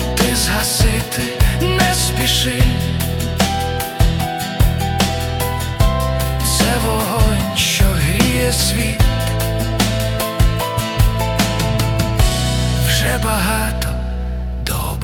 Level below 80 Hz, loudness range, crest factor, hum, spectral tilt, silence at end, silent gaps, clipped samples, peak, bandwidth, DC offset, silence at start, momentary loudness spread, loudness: -22 dBFS; 2 LU; 16 dB; none; -4 dB/octave; 0 s; none; under 0.1%; 0 dBFS; 18 kHz; under 0.1%; 0 s; 5 LU; -17 LUFS